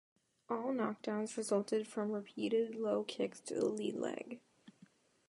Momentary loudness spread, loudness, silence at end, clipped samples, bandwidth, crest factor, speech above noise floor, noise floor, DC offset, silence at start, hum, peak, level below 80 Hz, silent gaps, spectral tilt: 6 LU; -38 LUFS; 0.6 s; under 0.1%; 11.5 kHz; 18 dB; 29 dB; -67 dBFS; under 0.1%; 0.5 s; none; -22 dBFS; -86 dBFS; none; -5 dB/octave